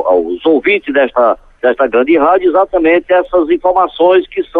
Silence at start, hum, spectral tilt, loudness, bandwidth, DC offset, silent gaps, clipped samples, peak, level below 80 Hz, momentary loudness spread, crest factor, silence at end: 0 s; none; -7 dB/octave; -11 LUFS; 4.1 kHz; under 0.1%; none; under 0.1%; -2 dBFS; -44 dBFS; 3 LU; 10 dB; 0 s